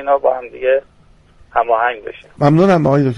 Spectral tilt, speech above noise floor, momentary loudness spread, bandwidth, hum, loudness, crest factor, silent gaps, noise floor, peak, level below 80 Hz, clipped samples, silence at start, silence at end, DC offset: -8.5 dB/octave; 32 dB; 9 LU; 10 kHz; none; -15 LUFS; 14 dB; none; -47 dBFS; 0 dBFS; -48 dBFS; under 0.1%; 0 s; 0 s; under 0.1%